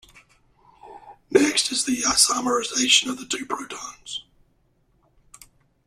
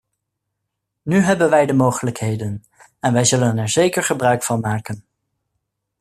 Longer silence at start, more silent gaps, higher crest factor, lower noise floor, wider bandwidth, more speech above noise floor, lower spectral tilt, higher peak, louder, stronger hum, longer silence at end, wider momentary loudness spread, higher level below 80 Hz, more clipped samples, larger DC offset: second, 0.85 s vs 1.05 s; neither; first, 24 dB vs 16 dB; second, -64 dBFS vs -78 dBFS; about the same, 15 kHz vs 14 kHz; second, 42 dB vs 60 dB; second, -0.5 dB/octave vs -5 dB/octave; about the same, -2 dBFS vs -2 dBFS; about the same, -20 LUFS vs -18 LUFS; neither; first, 1.65 s vs 1 s; first, 17 LU vs 14 LU; about the same, -60 dBFS vs -56 dBFS; neither; neither